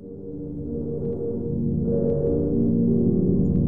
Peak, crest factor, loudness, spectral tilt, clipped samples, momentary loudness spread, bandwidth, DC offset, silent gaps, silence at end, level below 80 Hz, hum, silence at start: -10 dBFS; 14 dB; -24 LUFS; -15 dB/octave; under 0.1%; 12 LU; 1.6 kHz; 1%; none; 0 s; -38 dBFS; none; 0 s